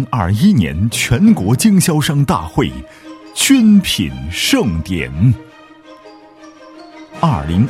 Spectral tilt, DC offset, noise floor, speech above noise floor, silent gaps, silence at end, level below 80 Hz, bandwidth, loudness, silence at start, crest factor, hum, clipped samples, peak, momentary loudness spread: -5 dB/octave; under 0.1%; -40 dBFS; 27 dB; none; 0 s; -34 dBFS; 16 kHz; -14 LUFS; 0 s; 14 dB; none; under 0.1%; 0 dBFS; 10 LU